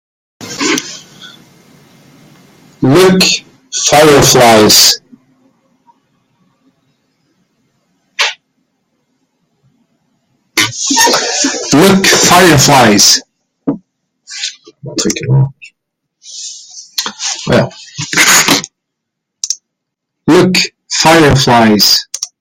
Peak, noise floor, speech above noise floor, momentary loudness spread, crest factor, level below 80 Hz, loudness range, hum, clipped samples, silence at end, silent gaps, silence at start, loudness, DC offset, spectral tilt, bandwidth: 0 dBFS; -74 dBFS; 67 dB; 18 LU; 12 dB; -42 dBFS; 15 LU; none; 0.3%; 0.15 s; none; 0.4 s; -8 LUFS; under 0.1%; -3 dB/octave; over 20 kHz